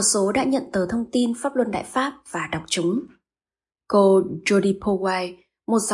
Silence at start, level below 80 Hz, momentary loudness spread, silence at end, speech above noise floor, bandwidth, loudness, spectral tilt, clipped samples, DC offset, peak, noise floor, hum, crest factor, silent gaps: 0 s; -56 dBFS; 10 LU; 0 s; over 69 dB; 11.5 kHz; -22 LUFS; -4 dB/octave; under 0.1%; under 0.1%; -6 dBFS; under -90 dBFS; none; 16 dB; none